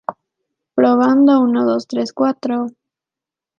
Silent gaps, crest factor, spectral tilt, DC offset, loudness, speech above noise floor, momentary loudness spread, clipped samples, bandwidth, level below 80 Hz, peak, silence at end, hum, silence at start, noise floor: none; 14 dB; -6 dB/octave; under 0.1%; -15 LUFS; 73 dB; 12 LU; under 0.1%; 7.2 kHz; -68 dBFS; -2 dBFS; 0.9 s; none; 0.1 s; -88 dBFS